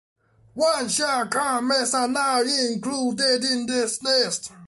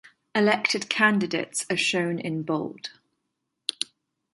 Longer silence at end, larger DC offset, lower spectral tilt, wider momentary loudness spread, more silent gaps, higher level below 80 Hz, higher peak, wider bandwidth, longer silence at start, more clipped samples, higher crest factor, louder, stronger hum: second, 0 s vs 0.5 s; neither; second, -1.5 dB/octave vs -3.5 dB/octave; second, 4 LU vs 12 LU; neither; first, -66 dBFS vs -72 dBFS; about the same, -8 dBFS vs -6 dBFS; about the same, 12 kHz vs 11.5 kHz; first, 0.55 s vs 0.35 s; neither; second, 14 dB vs 22 dB; first, -22 LUFS vs -25 LUFS; neither